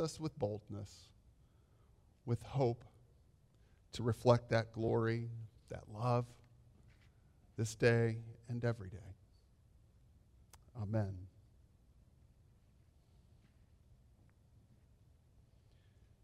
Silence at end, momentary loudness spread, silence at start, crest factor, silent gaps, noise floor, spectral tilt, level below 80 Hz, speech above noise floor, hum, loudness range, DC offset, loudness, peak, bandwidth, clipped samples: 4.95 s; 21 LU; 0 s; 24 dB; none; -68 dBFS; -7 dB/octave; -68 dBFS; 31 dB; none; 11 LU; under 0.1%; -38 LUFS; -16 dBFS; 12.5 kHz; under 0.1%